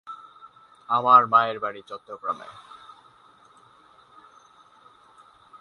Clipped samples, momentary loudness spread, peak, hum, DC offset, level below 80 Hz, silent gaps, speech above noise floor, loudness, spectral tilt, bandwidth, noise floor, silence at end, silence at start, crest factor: under 0.1%; 27 LU; -2 dBFS; none; under 0.1%; -76 dBFS; none; 33 dB; -21 LUFS; -5.5 dB/octave; 6.6 kHz; -55 dBFS; 3.1 s; 0.05 s; 24 dB